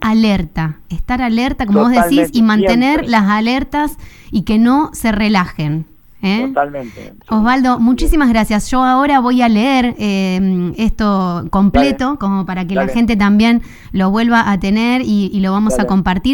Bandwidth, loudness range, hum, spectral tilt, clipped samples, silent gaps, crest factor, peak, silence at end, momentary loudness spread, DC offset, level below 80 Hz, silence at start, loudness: 17.5 kHz; 3 LU; none; -6 dB/octave; under 0.1%; none; 12 dB; 0 dBFS; 0 s; 9 LU; under 0.1%; -28 dBFS; 0 s; -14 LUFS